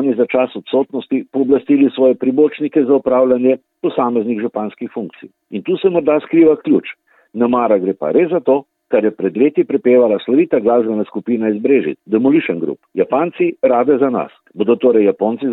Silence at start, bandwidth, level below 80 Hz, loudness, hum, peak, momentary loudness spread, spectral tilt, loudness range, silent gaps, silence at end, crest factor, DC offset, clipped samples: 0 s; 4.1 kHz; -60 dBFS; -15 LUFS; none; -2 dBFS; 9 LU; -10.5 dB/octave; 2 LU; none; 0 s; 14 dB; under 0.1%; under 0.1%